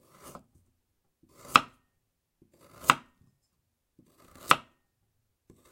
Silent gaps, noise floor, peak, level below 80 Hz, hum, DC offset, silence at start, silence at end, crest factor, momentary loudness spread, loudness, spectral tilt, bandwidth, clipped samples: none; -79 dBFS; 0 dBFS; -68 dBFS; none; under 0.1%; 1.55 s; 1.15 s; 34 dB; 26 LU; -26 LUFS; -2 dB/octave; 16.5 kHz; under 0.1%